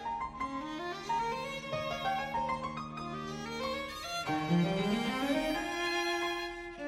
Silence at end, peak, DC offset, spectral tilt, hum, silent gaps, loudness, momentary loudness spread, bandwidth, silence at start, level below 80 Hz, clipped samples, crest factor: 0 s; -18 dBFS; under 0.1%; -5 dB/octave; none; none; -35 LUFS; 8 LU; 16 kHz; 0 s; -58 dBFS; under 0.1%; 16 dB